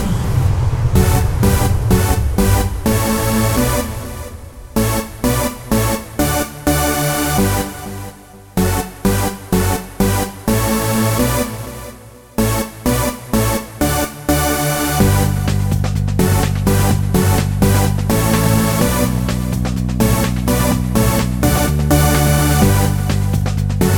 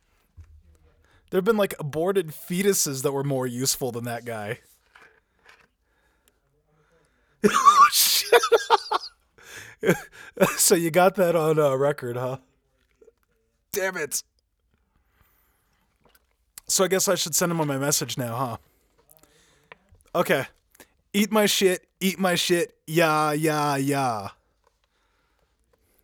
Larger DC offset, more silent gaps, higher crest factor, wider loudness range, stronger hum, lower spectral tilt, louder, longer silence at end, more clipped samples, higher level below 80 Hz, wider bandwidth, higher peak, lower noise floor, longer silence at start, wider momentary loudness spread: neither; neither; second, 14 dB vs 24 dB; second, 4 LU vs 13 LU; neither; first, -5.5 dB/octave vs -3.5 dB/octave; first, -16 LUFS vs -22 LUFS; second, 0 s vs 1.7 s; neither; first, -24 dBFS vs -64 dBFS; about the same, over 20 kHz vs over 20 kHz; about the same, 0 dBFS vs -2 dBFS; second, -37 dBFS vs -70 dBFS; second, 0 s vs 0.4 s; second, 6 LU vs 14 LU